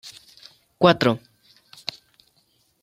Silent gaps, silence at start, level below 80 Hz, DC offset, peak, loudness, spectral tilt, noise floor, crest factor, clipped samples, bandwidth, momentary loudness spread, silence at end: none; 0.05 s; -62 dBFS; under 0.1%; -2 dBFS; -22 LUFS; -6 dB/octave; -65 dBFS; 24 dB; under 0.1%; 15 kHz; 23 LU; 1.65 s